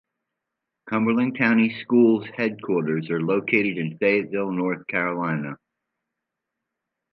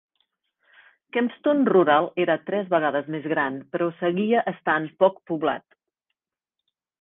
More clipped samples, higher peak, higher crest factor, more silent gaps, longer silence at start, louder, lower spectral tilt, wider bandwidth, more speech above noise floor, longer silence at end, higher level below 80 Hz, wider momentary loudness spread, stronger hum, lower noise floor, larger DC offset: neither; about the same, -4 dBFS vs -6 dBFS; about the same, 20 dB vs 18 dB; neither; second, 0.85 s vs 1.15 s; about the same, -23 LUFS vs -23 LUFS; about the same, -9.5 dB/octave vs -9.5 dB/octave; first, 5.8 kHz vs 3.9 kHz; about the same, 61 dB vs 64 dB; first, 1.55 s vs 1.4 s; about the same, -72 dBFS vs -70 dBFS; about the same, 8 LU vs 9 LU; neither; second, -83 dBFS vs -87 dBFS; neither